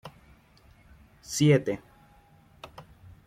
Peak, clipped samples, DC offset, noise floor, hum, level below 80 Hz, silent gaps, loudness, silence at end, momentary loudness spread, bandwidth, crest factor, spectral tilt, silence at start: -10 dBFS; under 0.1%; under 0.1%; -58 dBFS; none; -60 dBFS; none; -26 LUFS; 0.45 s; 28 LU; 15 kHz; 22 dB; -5.5 dB/octave; 0.05 s